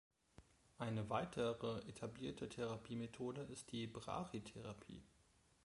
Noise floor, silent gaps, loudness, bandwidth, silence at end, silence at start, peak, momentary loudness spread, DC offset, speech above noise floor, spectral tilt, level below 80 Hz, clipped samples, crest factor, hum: -69 dBFS; none; -48 LUFS; 11.5 kHz; 0.6 s; 0.4 s; -28 dBFS; 11 LU; under 0.1%; 22 dB; -6 dB/octave; -72 dBFS; under 0.1%; 20 dB; none